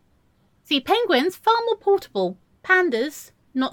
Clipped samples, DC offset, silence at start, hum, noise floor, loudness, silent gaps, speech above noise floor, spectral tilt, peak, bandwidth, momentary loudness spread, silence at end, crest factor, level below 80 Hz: under 0.1%; under 0.1%; 0.7 s; none; -62 dBFS; -21 LUFS; none; 41 dB; -3.5 dB/octave; -4 dBFS; 17.5 kHz; 11 LU; 0 s; 18 dB; -66 dBFS